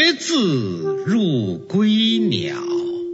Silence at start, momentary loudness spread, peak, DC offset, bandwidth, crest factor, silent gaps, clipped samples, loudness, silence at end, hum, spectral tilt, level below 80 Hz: 0 s; 8 LU; -4 dBFS; under 0.1%; 8 kHz; 16 dB; none; under 0.1%; -19 LUFS; 0 s; none; -5 dB/octave; -64 dBFS